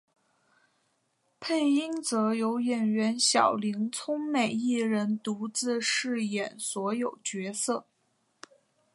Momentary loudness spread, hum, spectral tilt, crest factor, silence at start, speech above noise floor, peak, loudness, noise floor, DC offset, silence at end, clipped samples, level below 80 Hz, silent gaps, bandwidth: 8 LU; none; -3.5 dB/octave; 20 dB; 1.4 s; 46 dB; -10 dBFS; -28 LUFS; -74 dBFS; under 0.1%; 1.15 s; under 0.1%; -82 dBFS; none; 11.5 kHz